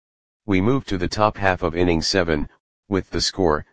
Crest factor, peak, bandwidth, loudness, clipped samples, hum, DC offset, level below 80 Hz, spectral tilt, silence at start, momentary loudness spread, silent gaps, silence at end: 20 dB; 0 dBFS; 10 kHz; -21 LUFS; under 0.1%; none; 2%; -38 dBFS; -5 dB/octave; 0.4 s; 7 LU; 2.60-2.83 s; 0 s